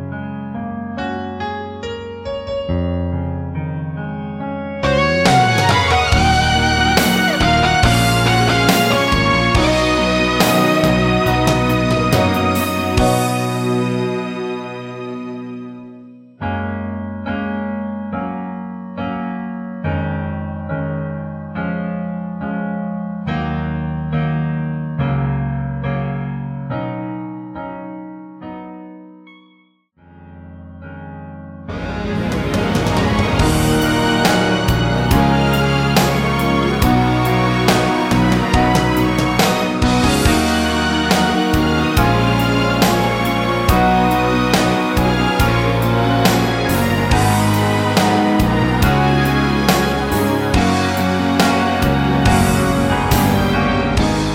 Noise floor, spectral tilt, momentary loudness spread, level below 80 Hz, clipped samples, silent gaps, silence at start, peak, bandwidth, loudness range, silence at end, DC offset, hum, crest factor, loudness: -55 dBFS; -5.5 dB/octave; 13 LU; -28 dBFS; under 0.1%; none; 0 s; 0 dBFS; 16.5 kHz; 12 LU; 0 s; under 0.1%; none; 16 dB; -16 LUFS